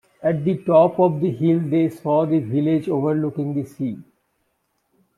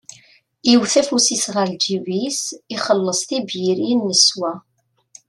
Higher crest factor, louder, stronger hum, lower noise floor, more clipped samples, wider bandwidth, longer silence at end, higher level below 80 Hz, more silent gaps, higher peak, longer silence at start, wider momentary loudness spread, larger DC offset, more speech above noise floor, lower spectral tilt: about the same, 18 dB vs 18 dB; about the same, -20 LUFS vs -18 LUFS; neither; first, -70 dBFS vs -52 dBFS; neither; about the same, 12 kHz vs 12.5 kHz; first, 1.15 s vs 0.7 s; about the same, -64 dBFS vs -68 dBFS; neither; about the same, -4 dBFS vs -2 dBFS; second, 0.2 s vs 0.65 s; about the same, 10 LU vs 12 LU; neither; first, 51 dB vs 34 dB; first, -10 dB/octave vs -2.5 dB/octave